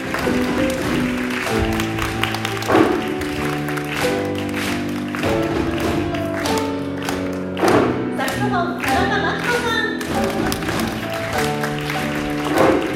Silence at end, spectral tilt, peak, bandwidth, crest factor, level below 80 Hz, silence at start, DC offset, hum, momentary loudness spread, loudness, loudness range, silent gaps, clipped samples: 0 s; -5 dB/octave; 0 dBFS; 17 kHz; 20 dB; -38 dBFS; 0 s; under 0.1%; none; 7 LU; -20 LUFS; 2 LU; none; under 0.1%